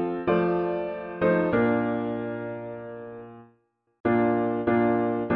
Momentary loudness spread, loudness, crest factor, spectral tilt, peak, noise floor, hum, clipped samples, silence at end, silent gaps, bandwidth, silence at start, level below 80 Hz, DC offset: 16 LU; -25 LUFS; 16 dB; -10.5 dB/octave; -10 dBFS; -68 dBFS; none; under 0.1%; 0 s; 4.00-4.04 s; 4.9 kHz; 0 s; -58 dBFS; under 0.1%